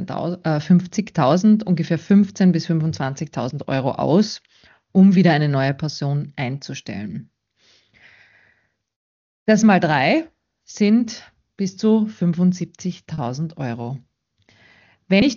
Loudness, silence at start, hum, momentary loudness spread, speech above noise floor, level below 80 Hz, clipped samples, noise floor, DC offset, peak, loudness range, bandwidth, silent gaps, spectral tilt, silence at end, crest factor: -19 LUFS; 0 s; none; 15 LU; 45 dB; -58 dBFS; under 0.1%; -64 dBFS; under 0.1%; -2 dBFS; 7 LU; 7.2 kHz; 8.96-9.46 s; -6.5 dB/octave; 0 s; 18 dB